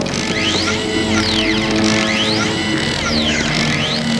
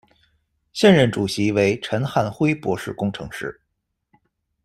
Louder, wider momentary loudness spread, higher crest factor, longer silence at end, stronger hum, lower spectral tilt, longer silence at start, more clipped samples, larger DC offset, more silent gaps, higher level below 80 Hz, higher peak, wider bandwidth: first, -15 LUFS vs -20 LUFS; second, 3 LU vs 16 LU; about the same, 16 dB vs 20 dB; second, 0 s vs 1.1 s; neither; second, -3.5 dB/octave vs -6 dB/octave; second, 0 s vs 0.75 s; neither; neither; neither; first, -36 dBFS vs -54 dBFS; about the same, 0 dBFS vs -2 dBFS; second, 11 kHz vs 14 kHz